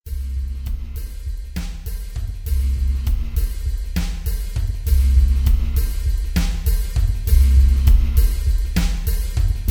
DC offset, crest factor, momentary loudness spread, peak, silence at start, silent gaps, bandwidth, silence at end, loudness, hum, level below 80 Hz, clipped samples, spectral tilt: under 0.1%; 16 dB; 14 LU; -2 dBFS; 0.05 s; none; 18.5 kHz; 0 s; -21 LUFS; none; -18 dBFS; under 0.1%; -6 dB/octave